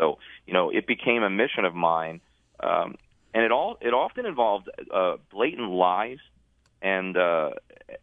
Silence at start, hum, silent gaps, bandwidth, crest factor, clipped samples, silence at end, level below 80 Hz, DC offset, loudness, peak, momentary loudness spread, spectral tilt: 0 s; none; none; 3.8 kHz; 20 dB; under 0.1%; 0.05 s; -66 dBFS; under 0.1%; -25 LUFS; -6 dBFS; 10 LU; -7.5 dB/octave